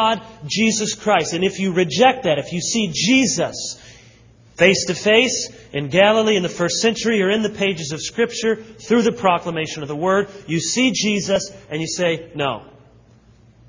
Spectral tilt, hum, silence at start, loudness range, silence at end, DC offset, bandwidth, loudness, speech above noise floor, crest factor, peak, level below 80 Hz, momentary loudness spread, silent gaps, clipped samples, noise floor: -3.5 dB/octave; none; 0 s; 3 LU; 1.05 s; under 0.1%; 7.6 kHz; -18 LUFS; 31 dB; 20 dB; 0 dBFS; -54 dBFS; 10 LU; none; under 0.1%; -50 dBFS